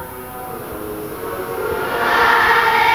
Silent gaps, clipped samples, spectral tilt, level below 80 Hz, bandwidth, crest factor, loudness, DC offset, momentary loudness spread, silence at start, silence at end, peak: none; under 0.1%; -3.5 dB/octave; -44 dBFS; 19 kHz; 18 dB; -16 LUFS; 0.2%; 17 LU; 0 s; 0 s; 0 dBFS